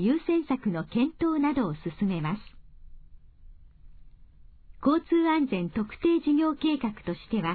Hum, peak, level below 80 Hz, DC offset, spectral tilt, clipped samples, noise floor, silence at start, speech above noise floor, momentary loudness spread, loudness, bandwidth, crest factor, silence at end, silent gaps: none; -12 dBFS; -52 dBFS; under 0.1%; -10.5 dB/octave; under 0.1%; -51 dBFS; 0 s; 25 dB; 8 LU; -27 LUFS; 4.7 kHz; 16 dB; 0 s; none